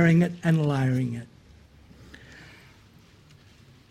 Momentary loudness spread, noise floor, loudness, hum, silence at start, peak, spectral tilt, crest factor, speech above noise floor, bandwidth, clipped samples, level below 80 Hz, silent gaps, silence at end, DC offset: 26 LU; -54 dBFS; -25 LUFS; none; 0 s; -8 dBFS; -8 dB/octave; 18 dB; 32 dB; 10.5 kHz; under 0.1%; -58 dBFS; none; 1.45 s; under 0.1%